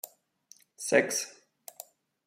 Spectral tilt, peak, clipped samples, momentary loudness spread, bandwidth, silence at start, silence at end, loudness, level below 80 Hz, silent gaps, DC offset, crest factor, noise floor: -2 dB/octave; -8 dBFS; under 0.1%; 24 LU; 16.5 kHz; 0.05 s; 0.45 s; -29 LUFS; -82 dBFS; none; under 0.1%; 26 dB; -61 dBFS